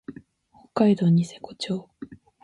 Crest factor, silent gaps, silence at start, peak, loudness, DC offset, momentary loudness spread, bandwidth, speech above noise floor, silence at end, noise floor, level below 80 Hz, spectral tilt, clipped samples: 18 dB; none; 0.1 s; -8 dBFS; -24 LUFS; under 0.1%; 23 LU; 11 kHz; 36 dB; 0.3 s; -58 dBFS; -64 dBFS; -7.5 dB/octave; under 0.1%